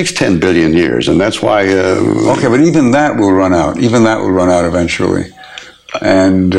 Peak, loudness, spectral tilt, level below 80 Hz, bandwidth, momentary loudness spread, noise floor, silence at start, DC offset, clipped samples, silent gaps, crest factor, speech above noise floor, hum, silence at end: 0 dBFS; -11 LUFS; -5.5 dB/octave; -40 dBFS; 12 kHz; 8 LU; -32 dBFS; 0 s; under 0.1%; under 0.1%; none; 10 dB; 22 dB; none; 0 s